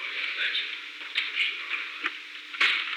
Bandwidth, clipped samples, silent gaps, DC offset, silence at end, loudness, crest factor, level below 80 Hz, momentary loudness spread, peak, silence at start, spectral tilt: 18 kHz; under 0.1%; none; under 0.1%; 0 s; -28 LUFS; 18 dB; under -90 dBFS; 11 LU; -12 dBFS; 0 s; 3.5 dB/octave